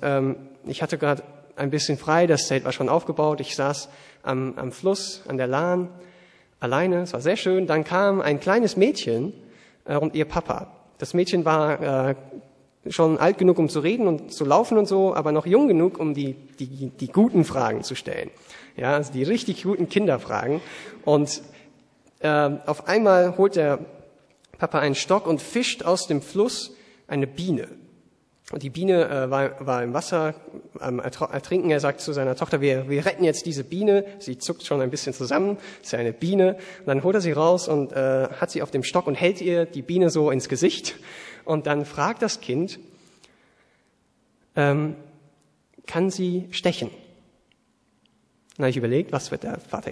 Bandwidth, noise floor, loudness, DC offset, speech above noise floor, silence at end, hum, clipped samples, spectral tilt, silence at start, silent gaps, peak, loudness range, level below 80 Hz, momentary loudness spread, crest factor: 11 kHz; -66 dBFS; -23 LUFS; under 0.1%; 43 dB; 0 s; none; under 0.1%; -5.5 dB/octave; 0 s; none; -4 dBFS; 6 LU; -60 dBFS; 13 LU; 20 dB